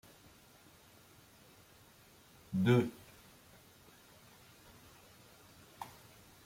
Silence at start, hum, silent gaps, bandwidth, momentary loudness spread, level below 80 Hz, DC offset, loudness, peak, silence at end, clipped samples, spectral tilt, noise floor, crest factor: 2.5 s; none; none; 16.5 kHz; 28 LU; -72 dBFS; under 0.1%; -35 LUFS; -16 dBFS; 0.6 s; under 0.1%; -7 dB/octave; -62 dBFS; 26 dB